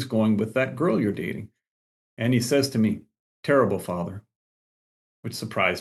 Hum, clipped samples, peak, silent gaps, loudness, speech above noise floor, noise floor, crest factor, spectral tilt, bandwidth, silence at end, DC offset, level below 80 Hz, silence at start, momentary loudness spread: none; under 0.1%; -6 dBFS; 1.68-2.17 s, 3.19-3.43 s, 4.36-5.23 s; -25 LUFS; over 66 dB; under -90 dBFS; 18 dB; -6 dB/octave; 12.5 kHz; 0 s; under 0.1%; -70 dBFS; 0 s; 14 LU